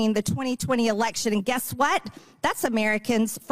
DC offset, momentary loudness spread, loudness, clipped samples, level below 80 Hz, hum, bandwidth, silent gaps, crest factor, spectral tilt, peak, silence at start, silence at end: 0.4%; 5 LU; -25 LUFS; under 0.1%; -58 dBFS; none; 16 kHz; none; 16 dB; -4 dB/octave; -10 dBFS; 0 s; 0 s